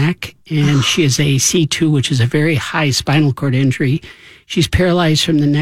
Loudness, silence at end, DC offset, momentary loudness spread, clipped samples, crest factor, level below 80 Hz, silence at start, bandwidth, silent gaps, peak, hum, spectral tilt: -14 LUFS; 0 s; under 0.1%; 5 LU; under 0.1%; 12 dB; -36 dBFS; 0 s; 15.5 kHz; none; -2 dBFS; none; -4.5 dB/octave